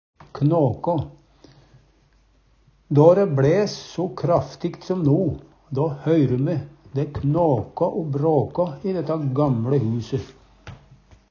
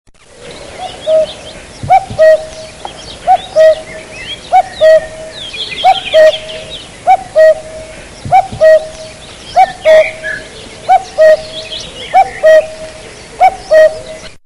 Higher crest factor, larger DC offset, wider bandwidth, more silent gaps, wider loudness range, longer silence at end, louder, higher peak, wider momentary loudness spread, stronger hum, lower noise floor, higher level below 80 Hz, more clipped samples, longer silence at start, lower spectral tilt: first, 20 dB vs 10 dB; neither; second, 7 kHz vs 11.5 kHz; neither; about the same, 3 LU vs 2 LU; first, 0.55 s vs 0.15 s; second, -22 LUFS vs -9 LUFS; about the same, -2 dBFS vs 0 dBFS; second, 12 LU vs 20 LU; neither; first, -58 dBFS vs -33 dBFS; second, -50 dBFS vs -40 dBFS; second, under 0.1% vs 0.2%; about the same, 0.35 s vs 0.4 s; first, -8.5 dB/octave vs -3 dB/octave